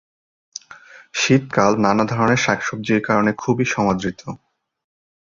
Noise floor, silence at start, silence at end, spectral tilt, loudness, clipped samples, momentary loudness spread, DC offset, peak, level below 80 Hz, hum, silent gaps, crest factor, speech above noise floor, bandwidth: -44 dBFS; 0.55 s; 0.9 s; -5 dB/octave; -18 LUFS; under 0.1%; 20 LU; under 0.1%; -2 dBFS; -52 dBFS; none; none; 18 dB; 26 dB; 7.6 kHz